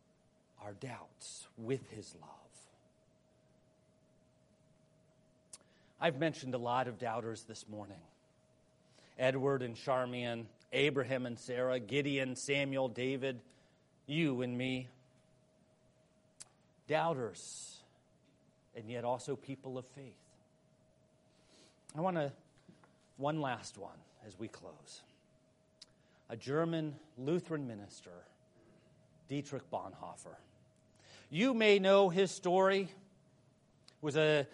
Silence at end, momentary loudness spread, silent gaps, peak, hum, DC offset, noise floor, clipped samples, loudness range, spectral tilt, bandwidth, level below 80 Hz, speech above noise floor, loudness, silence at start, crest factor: 0.05 s; 24 LU; none; -14 dBFS; none; under 0.1%; -71 dBFS; under 0.1%; 14 LU; -5 dB/octave; 11.5 kHz; -80 dBFS; 35 dB; -36 LUFS; 0.6 s; 24 dB